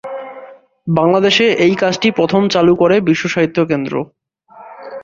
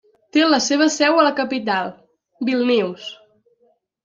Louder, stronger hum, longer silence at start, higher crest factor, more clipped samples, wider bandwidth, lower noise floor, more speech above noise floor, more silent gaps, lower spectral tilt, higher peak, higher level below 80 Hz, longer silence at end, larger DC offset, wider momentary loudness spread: first, -13 LUFS vs -18 LUFS; neither; second, 0.05 s vs 0.35 s; about the same, 14 dB vs 18 dB; neither; about the same, 7.6 kHz vs 7.6 kHz; second, -42 dBFS vs -62 dBFS; second, 29 dB vs 44 dB; neither; first, -5.5 dB/octave vs -3 dB/octave; about the same, 0 dBFS vs -2 dBFS; first, -52 dBFS vs -70 dBFS; second, 0 s vs 0.9 s; neither; first, 18 LU vs 12 LU